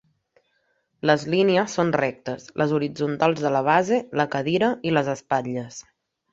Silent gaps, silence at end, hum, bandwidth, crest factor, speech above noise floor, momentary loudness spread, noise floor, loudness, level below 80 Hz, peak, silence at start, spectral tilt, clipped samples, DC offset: none; 0.5 s; none; 8 kHz; 20 dB; 47 dB; 11 LU; -70 dBFS; -23 LUFS; -62 dBFS; -4 dBFS; 1.05 s; -5.5 dB/octave; under 0.1%; under 0.1%